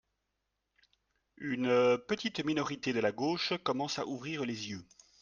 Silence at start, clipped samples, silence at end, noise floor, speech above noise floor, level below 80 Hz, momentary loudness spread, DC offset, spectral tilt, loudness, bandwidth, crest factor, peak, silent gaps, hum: 1.4 s; under 0.1%; 0.4 s; -84 dBFS; 51 dB; -72 dBFS; 11 LU; under 0.1%; -4.5 dB/octave; -33 LUFS; 7.4 kHz; 18 dB; -16 dBFS; none; none